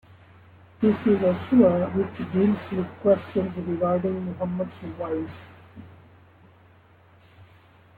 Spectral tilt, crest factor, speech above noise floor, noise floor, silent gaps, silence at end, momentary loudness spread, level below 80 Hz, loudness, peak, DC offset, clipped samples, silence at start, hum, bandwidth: -10.5 dB/octave; 20 dB; 31 dB; -55 dBFS; none; 0.55 s; 12 LU; -60 dBFS; -24 LUFS; -4 dBFS; under 0.1%; under 0.1%; 0.8 s; none; 4.5 kHz